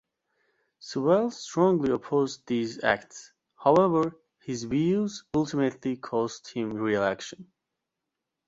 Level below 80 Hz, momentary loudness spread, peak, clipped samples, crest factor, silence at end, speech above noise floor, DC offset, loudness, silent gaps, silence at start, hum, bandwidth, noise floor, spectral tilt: -64 dBFS; 13 LU; -6 dBFS; under 0.1%; 22 dB; 1.05 s; 59 dB; under 0.1%; -27 LUFS; none; 0.85 s; none; 8 kHz; -85 dBFS; -6 dB/octave